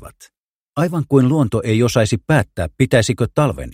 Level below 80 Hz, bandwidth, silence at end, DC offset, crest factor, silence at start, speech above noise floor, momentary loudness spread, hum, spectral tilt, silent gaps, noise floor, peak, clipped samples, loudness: -40 dBFS; 16 kHz; 0 s; under 0.1%; 16 dB; 0 s; 47 dB; 6 LU; none; -6 dB/octave; 0.38-0.73 s; -63 dBFS; 0 dBFS; under 0.1%; -17 LUFS